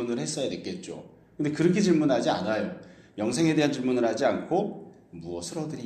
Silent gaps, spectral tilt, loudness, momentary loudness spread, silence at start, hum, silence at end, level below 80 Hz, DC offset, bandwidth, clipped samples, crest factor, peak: none; -5.5 dB/octave; -27 LUFS; 20 LU; 0 s; none; 0 s; -64 dBFS; under 0.1%; 12.5 kHz; under 0.1%; 16 dB; -10 dBFS